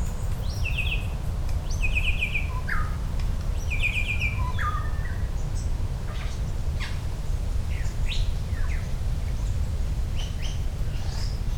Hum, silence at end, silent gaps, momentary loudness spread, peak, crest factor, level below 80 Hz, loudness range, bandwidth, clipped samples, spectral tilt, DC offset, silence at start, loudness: none; 0 s; none; 6 LU; -12 dBFS; 14 dB; -28 dBFS; 4 LU; 16.5 kHz; under 0.1%; -5 dB/octave; under 0.1%; 0 s; -29 LUFS